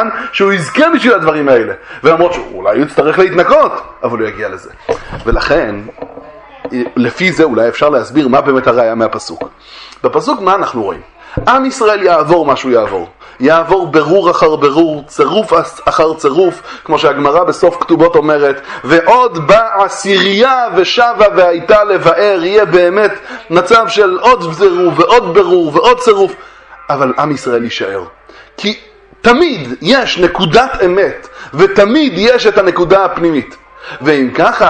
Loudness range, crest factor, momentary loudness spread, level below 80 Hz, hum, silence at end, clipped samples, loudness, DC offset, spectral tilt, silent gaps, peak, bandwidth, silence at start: 5 LU; 10 dB; 11 LU; -36 dBFS; none; 0 s; 0.5%; -10 LUFS; under 0.1%; -5 dB/octave; none; 0 dBFS; 10.5 kHz; 0 s